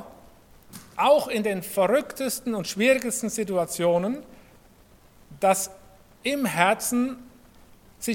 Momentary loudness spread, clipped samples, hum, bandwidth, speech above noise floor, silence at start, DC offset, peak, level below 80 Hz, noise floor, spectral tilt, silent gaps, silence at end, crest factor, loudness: 11 LU; under 0.1%; none; 17.5 kHz; 31 dB; 0 s; under 0.1%; -2 dBFS; -60 dBFS; -54 dBFS; -3.5 dB/octave; none; 0 s; 24 dB; -24 LUFS